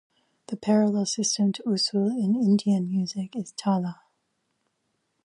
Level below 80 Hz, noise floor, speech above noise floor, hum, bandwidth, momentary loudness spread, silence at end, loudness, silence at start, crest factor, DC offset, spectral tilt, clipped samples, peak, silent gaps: -74 dBFS; -75 dBFS; 51 dB; none; 11 kHz; 10 LU; 1.3 s; -25 LUFS; 0.5 s; 16 dB; under 0.1%; -5 dB/octave; under 0.1%; -10 dBFS; none